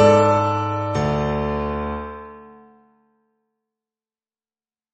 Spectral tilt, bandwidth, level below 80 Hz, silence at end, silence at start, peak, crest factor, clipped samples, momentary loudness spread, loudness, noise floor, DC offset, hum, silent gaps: -7 dB/octave; 8.4 kHz; -40 dBFS; 2.45 s; 0 s; -2 dBFS; 20 dB; under 0.1%; 18 LU; -21 LUFS; under -90 dBFS; under 0.1%; none; none